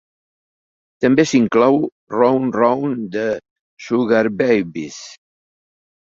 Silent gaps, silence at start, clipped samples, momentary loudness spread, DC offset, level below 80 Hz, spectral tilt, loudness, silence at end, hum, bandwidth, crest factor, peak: 1.92-2.07 s, 3.51-3.77 s; 1 s; under 0.1%; 15 LU; under 0.1%; -58 dBFS; -6 dB/octave; -17 LUFS; 1 s; none; 7.8 kHz; 16 dB; -2 dBFS